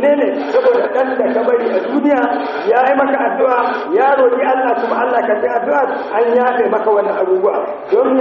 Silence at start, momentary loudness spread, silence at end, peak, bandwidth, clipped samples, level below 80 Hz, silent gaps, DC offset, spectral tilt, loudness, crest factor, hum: 0 s; 3 LU; 0 s; 0 dBFS; 6 kHz; under 0.1%; -64 dBFS; none; under 0.1%; -2.5 dB/octave; -14 LUFS; 12 dB; none